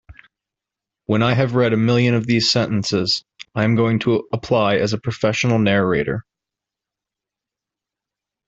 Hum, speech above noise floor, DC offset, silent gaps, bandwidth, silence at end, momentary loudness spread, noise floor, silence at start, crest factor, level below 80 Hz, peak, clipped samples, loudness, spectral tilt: none; 69 dB; under 0.1%; none; 7.8 kHz; 2.25 s; 6 LU; -86 dBFS; 0.1 s; 18 dB; -52 dBFS; -2 dBFS; under 0.1%; -18 LUFS; -5.5 dB/octave